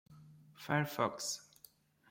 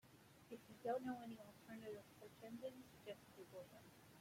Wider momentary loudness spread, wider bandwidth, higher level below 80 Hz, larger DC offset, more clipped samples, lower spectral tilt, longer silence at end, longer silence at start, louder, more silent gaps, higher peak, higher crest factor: about the same, 17 LU vs 16 LU; about the same, 16.5 kHz vs 16.5 kHz; first, -78 dBFS vs -86 dBFS; neither; neither; second, -4 dB/octave vs -5.5 dB/octave; first, 0.7 s vs 0 s; about the same, 0.1 s vs 0.05 s; first, -37 LUFS vs -54 LUFS; neither; first, -18 dBFS vs -34 dBFS; about the same, 22 dB vs 20 dB